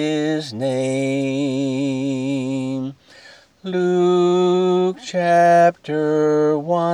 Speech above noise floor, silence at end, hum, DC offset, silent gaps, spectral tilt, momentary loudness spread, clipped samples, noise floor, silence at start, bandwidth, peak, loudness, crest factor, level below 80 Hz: 29 dB; 0 s; none; under 0.1%; none; -6.5 dB/octave; 9 LU; under 0.1%; -46 dBFS; 0 s; 10.5 kHz; -4 dBFS; -19 LUFS; 14 dB; -70 dBFS